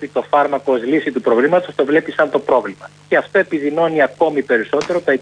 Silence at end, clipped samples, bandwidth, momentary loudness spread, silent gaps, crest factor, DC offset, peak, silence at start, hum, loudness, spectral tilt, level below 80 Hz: 0 s; under 0.1%; 10 kHz; 3 LU; none; 14 dB; under 0.1%; -2 dBFS; 0 s; none; -16 LUFS; -6 dB/octave; -62 dBFS